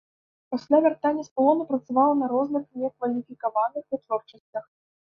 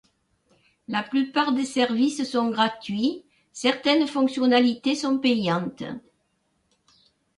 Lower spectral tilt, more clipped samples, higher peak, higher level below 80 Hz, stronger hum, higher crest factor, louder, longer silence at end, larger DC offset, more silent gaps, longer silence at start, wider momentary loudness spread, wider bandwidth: first, -7 dB/octave vs -4.5 dB/octave; neither; about the same, -8 dBFS vs -8 dBFS; second, -76 dBFS vs -68 dBFS; neither; about the same, 18 dB vs 18 dB; about the same, -25 LUFS vs -23 LUFS; second, 0.5 s vs 1.4 s; neither; first, 1.31-1.36 s, 4.40-4.53 s vs none; second, 0.5 s vs 0.9 s; about the same, 13 LU vs 12 LU; second, 6.8 kHz vs 11.5 kHz